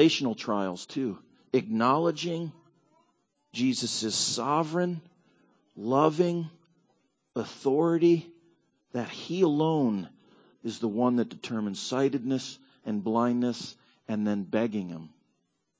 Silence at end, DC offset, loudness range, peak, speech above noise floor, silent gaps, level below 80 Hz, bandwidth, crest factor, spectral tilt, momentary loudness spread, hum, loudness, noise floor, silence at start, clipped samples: 0.7 s; under 0.1%; 3 LU; -8 dBFS; 48 dB; none; -74 dBFS; 8 kHz; 22 dB; -5 dB/octave; 15 LU; none; -28 LUFS; -76 dBFS; 0 s; under 0.1%